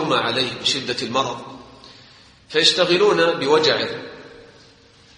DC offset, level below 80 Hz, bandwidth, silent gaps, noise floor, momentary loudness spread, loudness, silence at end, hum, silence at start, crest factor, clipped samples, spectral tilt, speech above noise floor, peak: under 0.1%; -60 dBFS; 10 kHz; none; -50 dBFS; 16 LU; -18 LUFS; 0.75 s; none; 0 s; 20 dB; under 0.1%; -3 dB/octave; 31 dB; 0 dBFS